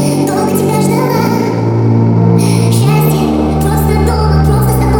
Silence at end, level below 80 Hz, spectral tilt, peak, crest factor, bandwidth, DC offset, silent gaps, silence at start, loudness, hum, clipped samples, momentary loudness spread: 0 s; -22 dBFS; -7 dB/octave; 0 dBFS; 10 dB; 18.5 kHz; under 0.1%; none; 0 s; -11 LUFS; none; under 0.1%; 3 LU